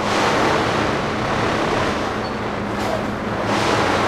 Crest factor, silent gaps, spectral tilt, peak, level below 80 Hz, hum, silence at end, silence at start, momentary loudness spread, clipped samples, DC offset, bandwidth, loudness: 16 dB; none; -4.5 dB/octave; -4 dBFS; -40 dBFS; none; 0 s; 0 s; 6 LU; under 0.1%; under 0.1%; 15.5 kHz; -20 LUFS